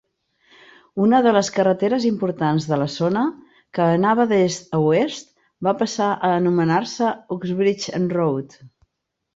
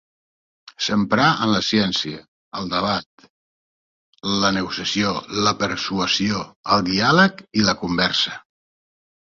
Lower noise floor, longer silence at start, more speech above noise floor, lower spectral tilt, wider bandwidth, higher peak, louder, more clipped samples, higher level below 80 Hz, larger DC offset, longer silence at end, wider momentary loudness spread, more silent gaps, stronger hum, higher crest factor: second, -78 dBFS vs under -90 dBFS; first, 0.95 s vs 0.8 s; second, 59 dB vs over 70 dB; first, -6 dB/octave vs -4 dB/octave; about the same, 8 kHz vs 7.6 kHz; about the same, -4 dBFS vs -2 dBFS; about the same, -20 LUFS vs -20 LUFS; neither; second, -62 dBFS vs -52 dBFS; neither; second, 0.7 s vs 0.95 s; about the same, 9 LU vs 10 LU; second, none vs 2.28-2.51 s, 3.06-3.18 s, 3.30-4.13 s, 6.56-6.64 s; neither; about the same, 16 dB vs 20 dB